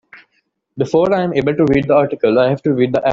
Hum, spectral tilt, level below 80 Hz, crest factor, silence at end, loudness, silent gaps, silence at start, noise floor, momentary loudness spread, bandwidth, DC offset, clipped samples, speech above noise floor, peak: none; -8 dB/octave; -46 dBFS; 12 dB; 0 s; -15 LUFS; none; 0.15 s; -65 dBFS; 3 LU; 7.6 kHz; under 0.1%; under 0.1%; 51 dB; -2 dBFS